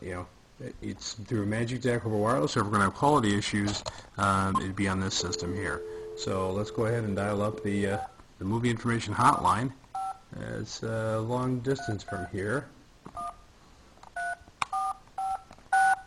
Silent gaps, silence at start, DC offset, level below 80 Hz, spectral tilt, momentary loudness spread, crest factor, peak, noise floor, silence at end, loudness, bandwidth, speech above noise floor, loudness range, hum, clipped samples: none; 0 s; under 0.1%; -54 dBFS; -5 dB/octave; 14 LU; 22 dB; -8 dBFS; -55 dBFS; 0 s; -30 LUFS; 13 kHz; 26 dB; 8 LU; none; under 0.1%